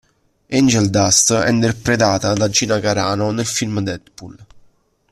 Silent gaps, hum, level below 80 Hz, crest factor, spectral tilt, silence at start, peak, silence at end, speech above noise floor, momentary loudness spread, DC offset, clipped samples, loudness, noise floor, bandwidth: none; none; -48 dBFS; 18 dB; -4 dB/octave; 0.5 s; 0 dBFS; 0.7 s; 38 dB; 9 LU; under 0.1%; under 0.1%; -16 LUFS; -54 dBFS; 14 kHz